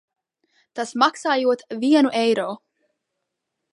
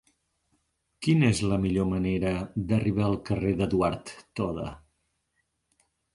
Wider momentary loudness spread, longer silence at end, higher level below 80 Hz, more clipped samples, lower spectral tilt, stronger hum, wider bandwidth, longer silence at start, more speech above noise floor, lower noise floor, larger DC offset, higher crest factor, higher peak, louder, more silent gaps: first, 13 LU vs 10 LU; second, 1.15 s vs 1.35 s; second, -78 dBFS vs -46 dBFS; neither; second, -4 dB/octave vs -7 dB/octave; neither; about the same, 11.5 kHz vs 11.5 kHz; second, 0.75 s vs 1 s; first, 60 dB vs 50 dB; first, -80 dBFS vs -76 dBFS; neither; about the same, 20 dB vs 18 dB; first, -4 dBFS vs -10 dBFS; first, -20 LUFS vs -27 LUFS; neither